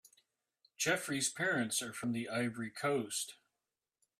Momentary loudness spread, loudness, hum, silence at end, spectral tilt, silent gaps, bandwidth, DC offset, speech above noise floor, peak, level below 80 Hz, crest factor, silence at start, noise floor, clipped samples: 6 LU; -36 LUFS; none; 0.85 s; -3 dB/octave; none; 15.5 kHz; under 0.1%; over 53 dB; -20 dBFS; -80 dBFS; 20 dB; 0.8 s; under -90 dBFS; under 0.1%